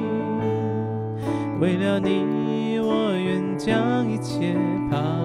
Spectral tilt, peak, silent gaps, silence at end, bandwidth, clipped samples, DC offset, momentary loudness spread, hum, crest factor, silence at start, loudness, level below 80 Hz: -7.5 dB/octave; -8 dBFS; none; 0 s; 12 kHz; under 0.1%; under 0.1%; 5 LU; none; 16 dB; 0 s; -24 LUFS; -54 dBFS